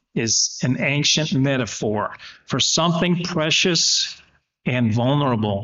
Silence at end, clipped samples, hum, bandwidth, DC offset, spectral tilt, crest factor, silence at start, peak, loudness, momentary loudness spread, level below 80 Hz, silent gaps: 0 s; under 0.1%; none; 8 kHz; under 0.1%; -3.5 dB/octave; 14 dB; 0.15 s; -6 dBFS; -19 LUFS; 10 LU; -56 dBFS; none